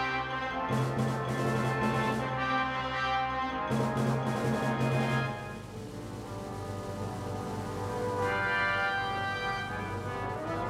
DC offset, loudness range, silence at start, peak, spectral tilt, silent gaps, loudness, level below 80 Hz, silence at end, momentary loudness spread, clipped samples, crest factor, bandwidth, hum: under 0.1%; 4 LU; 0 s; -18 dBFS; -6 dB/octave; none; -32 LUFS; -52 dBFS; 0 s; 10 LU; under 0.1%; 14 dB; 15 kHz; none